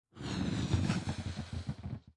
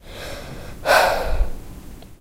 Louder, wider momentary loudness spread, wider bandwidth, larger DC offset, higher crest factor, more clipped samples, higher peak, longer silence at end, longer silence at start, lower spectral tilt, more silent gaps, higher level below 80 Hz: second, -37 LUFS vs -20 LUFS; second, 9 LU vs 23 LU; second, 11.5 kHz vs 16 kHz; neither; about the same, 18 dB vs 20 dB; neither; second, -18 dBFS vs -2 dBFS; about the same, 0.05 s vs 0.05 s; about the same, 0.15 s vs 0.05 s; first, -6 dB/octave vs -3 dB/octave; neither; second, -52 dBFS vs -28 dBFS